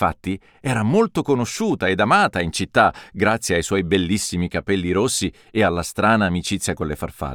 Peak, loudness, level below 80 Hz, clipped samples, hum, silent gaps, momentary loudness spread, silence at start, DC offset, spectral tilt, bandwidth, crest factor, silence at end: -2 dBFS; -20 LUFS; -42 dBFS; under 0.1%; none; none; 8 LU; 0 s; under 0.1%; -4.5 dB/octave; 19 kHz; 18 dB; 0 s